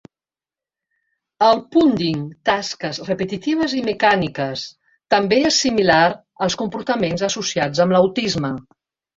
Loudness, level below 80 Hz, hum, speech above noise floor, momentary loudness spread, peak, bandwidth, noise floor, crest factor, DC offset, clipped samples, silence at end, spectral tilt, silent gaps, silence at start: -18 LUFS; -54 dBFS; none; over 72 dB; 10 LU; 0 dBFS; 8 kHz; under -90 dBFS; 18 dB; under 0.1%; under 0.1%; 0.55 s; -4.5 dB/octave; none; 1.4 s